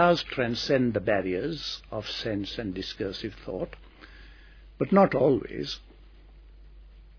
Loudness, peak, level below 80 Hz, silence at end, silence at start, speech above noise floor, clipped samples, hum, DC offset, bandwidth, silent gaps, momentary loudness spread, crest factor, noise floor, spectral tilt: -28 LUFS; -8 dBFS; -50 dBFS; 0.05 s; 0 s; 24 dB; under 0.1%; none; under 0.1%; 5.4 kHz; none; 14 LU; 22 dB; -51 dBFS; -6 dB/octave